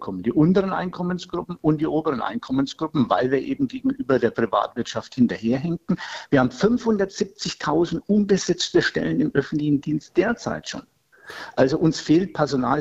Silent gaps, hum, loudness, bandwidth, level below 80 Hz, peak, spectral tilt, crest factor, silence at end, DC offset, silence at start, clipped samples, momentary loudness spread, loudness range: none; none; -22 LUFS; 8.2 kHz; -52 dBFS; -4 dBFS; -6 dB/octave; 18 dB; 0 s; under 0.1%; 0 s; under 0.1%; 8 LU; 2 LU